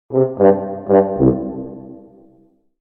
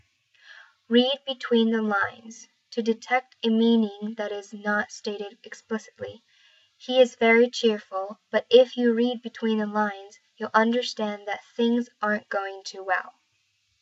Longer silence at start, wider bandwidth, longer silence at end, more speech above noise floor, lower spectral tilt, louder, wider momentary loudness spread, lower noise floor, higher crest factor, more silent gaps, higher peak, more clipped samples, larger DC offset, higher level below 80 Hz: second, 0.1 s vs 0.5 s; second, 3.1 kHz vs 8 kHz; about the same, 0.8 s vs 0.7 s; second, 40 dB vs 46 dB; first, -14 dB/octave vs -4.5 dB/octave; first, -16 LUFS vs -25 LUFS; about the same, 17 LU vs 17 LU; second, -54 dBFS vs -71 dBFS; about the same, 16 dB vs 20 dB; neither; first, 0 dBFS vs -6 dBFS; neither; neither; first, -42 dBFS vs -82 dBFS